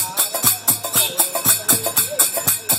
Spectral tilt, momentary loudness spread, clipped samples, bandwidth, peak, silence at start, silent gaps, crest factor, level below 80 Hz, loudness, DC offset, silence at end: -0.5 dB/octave; 3 LU; under 0.1%; 17 kHz; 0 dBFS; 0 s; none; 18 dB; -58 dBFS; -15 LUFS; under 0.1%; 0 s